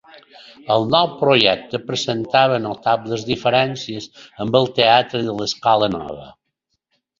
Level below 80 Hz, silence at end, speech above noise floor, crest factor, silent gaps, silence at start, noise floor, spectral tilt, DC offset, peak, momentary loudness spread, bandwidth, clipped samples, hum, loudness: -54 dBFS; 0.9 s; 56 dB; 18 dB; none; 0.65 s; -74 dBFS; -4.5 dB/octave; under 0.1%; 0 dBFS; 14 LU; 7.6 kHz; under 0.1%; none; -18 LUFS